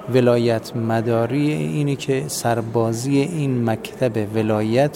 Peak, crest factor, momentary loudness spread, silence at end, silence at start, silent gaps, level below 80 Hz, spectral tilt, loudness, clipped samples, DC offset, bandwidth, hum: -2 dBFS; 16 dB; 5 LU; 0 s; 0 s; none; -56 dBFS; -6.5 dB/octave; -20 LUFS; under 0.1%; under 0.1%; 16.5 kHz; none